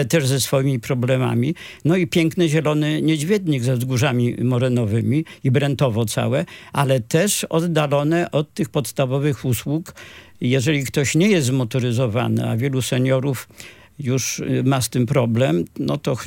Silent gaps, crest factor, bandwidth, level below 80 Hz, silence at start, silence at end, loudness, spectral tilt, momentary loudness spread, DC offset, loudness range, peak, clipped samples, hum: none; 14 dB; 17 kHz; -56 dBFS; 0 s; 0 s; -20 LUFS; -5.5 dB/octave; 6 LU; under 0.1%; 2 LU; -4 dBFS; under 0.1%; none